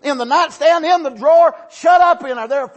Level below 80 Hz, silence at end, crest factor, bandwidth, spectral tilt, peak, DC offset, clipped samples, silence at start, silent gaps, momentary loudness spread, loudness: -62 dBFS; 0.1 s; 12 dB; 8.6 kHz; -2.5 dB/octave; -2 dBFS; under 0.1%; under 0.1%; 0.05 s; none; 8 LU; -14 LUFS